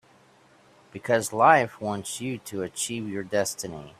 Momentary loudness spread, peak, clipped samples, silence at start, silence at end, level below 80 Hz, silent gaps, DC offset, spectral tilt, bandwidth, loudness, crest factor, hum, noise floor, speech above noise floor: 14 LU; -4 dBFS; under 0.1%; 0.95 s; 0.1 s; -66 dBFS; none; under 0.1%; -3.5 dB/octave; 16 kHz; -25 LUFS; 24 dB; none; -58 dBFS; 32 dB